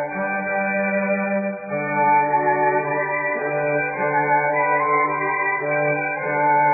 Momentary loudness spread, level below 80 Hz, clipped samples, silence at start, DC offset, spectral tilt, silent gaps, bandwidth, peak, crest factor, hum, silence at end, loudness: 5 LU; -68 dBFS; under 0.1%; 0 s; under 0.1%; -13.5 dB/octave; none; 2.6 kHz; -8 dBFS; 12 dB; none; 0 s; -20 LUFS